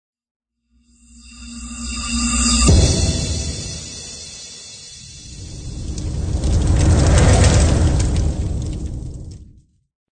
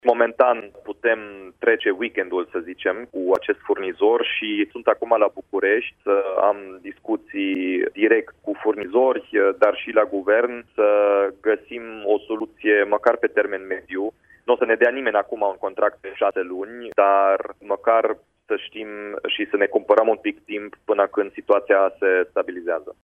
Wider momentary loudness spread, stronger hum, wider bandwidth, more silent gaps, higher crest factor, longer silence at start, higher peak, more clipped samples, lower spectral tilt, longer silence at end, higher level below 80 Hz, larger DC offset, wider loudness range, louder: first, 21 LU vs 11 LU; neither; first, 9.4 kHz vs 3.9 kHz; neither; about the same, 16 dB vs 20 dB; first, 1.25 s vs 0.05 s; about the same, -2 dBFS vs -2 dBFS; neither; about the same, -4.5 dB/octave vs -5.5 dB/octave; first, 0.7 s vs 0.1 s; first, -22 dBFS vs -66 dBFS; neither; first, 9 LU vs 2 LU; first, -17 LUFS vs -21 LUFS